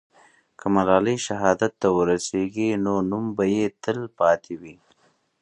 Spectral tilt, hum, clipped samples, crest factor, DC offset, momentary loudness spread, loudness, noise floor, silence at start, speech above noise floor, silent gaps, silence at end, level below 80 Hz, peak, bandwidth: -5.5 dB/octave; none; under 0.1%; 20 dB; under 0.1%; 8 LU; -23 LUFS; -64 dBFS; 0.65 s; 41 dB; none; 0.7 s; -56 dBFS; -2 dBFS; 11 kHz